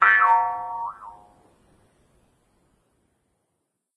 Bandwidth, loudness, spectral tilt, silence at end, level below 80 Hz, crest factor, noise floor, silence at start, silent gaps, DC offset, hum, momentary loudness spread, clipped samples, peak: 11 kHz; -21 LUFS; -3 dB/octave; 2.85 s; -70 dBFS; 22 dB; -77 dBFS; 0 s; none; under 0.1%; none; 27 LU; under 0.1%; -4 dBFS